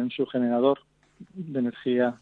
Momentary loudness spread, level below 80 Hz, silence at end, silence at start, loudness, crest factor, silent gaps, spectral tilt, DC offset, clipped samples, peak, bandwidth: 13 LU; -72 dBFS; 0.05 s; 0 s; -26 LUFS; 16 dB; none; -8.5 dB/octave; under 0.1%; under 0.1%; -10 dBFS; 4.3 kHz